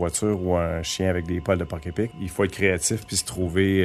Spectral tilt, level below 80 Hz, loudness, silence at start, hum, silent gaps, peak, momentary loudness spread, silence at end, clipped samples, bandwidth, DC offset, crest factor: -4.5 dB/octave; -46 dBFS; -25 LUFS; 0 s; none; none; -6 dBFS; 7 LU; 0 s; under 0.1%; 14 kHz; under 0.1%; 18 dB